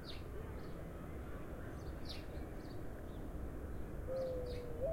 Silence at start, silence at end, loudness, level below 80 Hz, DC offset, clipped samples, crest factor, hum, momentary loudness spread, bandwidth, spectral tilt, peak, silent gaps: 0 s; 0 s; -47 LUFS; -50 dBFS; under 0.1%; under 0.1%; 14 dB; none; 7 LU; 16.5 kHz; -7 dB/octave; -30 dBFS; none